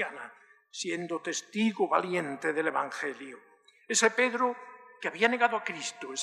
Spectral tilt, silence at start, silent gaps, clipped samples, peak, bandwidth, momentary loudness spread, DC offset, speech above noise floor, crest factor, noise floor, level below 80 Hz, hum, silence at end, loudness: -2.5 dB/octave; 0 s; none; under 0.1%; -8 dBFS; 13.5 kHz; 19 LU; under 0.1%; 22 dB; 22 dB; -52 dBFS; under -90 dBFS; none; 0 s; -30 LUFS